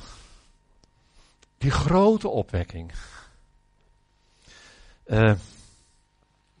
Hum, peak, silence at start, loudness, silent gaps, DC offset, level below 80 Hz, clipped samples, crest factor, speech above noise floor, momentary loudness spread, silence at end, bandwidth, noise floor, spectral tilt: none; -8 dBFS; 0 s; -23 LUFS; none; under 0.1%; -42 dBFS; under 0.1%; 20 dB; 43 dB; 23 LU; 1.15 s; 10 kHz; -65 dBFS; -7 dB/octave